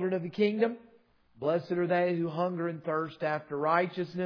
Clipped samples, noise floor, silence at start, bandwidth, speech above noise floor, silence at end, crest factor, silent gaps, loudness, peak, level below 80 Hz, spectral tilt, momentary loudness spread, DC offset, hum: under 0.1%; -63 dBFS; 0 s; 5.4 kHz; 33 dB; 0 s; 18 dB; none; -30 LUFS; -12 dBFS; -78 dBFS; -5.5 dB/octave; 6 LU; under 0.1%; none